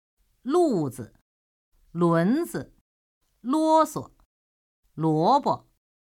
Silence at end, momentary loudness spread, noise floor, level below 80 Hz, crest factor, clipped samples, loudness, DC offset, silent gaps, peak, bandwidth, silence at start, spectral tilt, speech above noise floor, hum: 0.55 s; 18 LU; under -90 dBFS; -64 dBFS; 16 dB; under 0.1%; -24 LUFS; under 0.1%; 1.21-1.72 s, 2.81-3.21 s, 4.25-4.83 s; -10 dBFS; 17 kHz; 0.45 s; -7 dB/octave; over 67 dB; none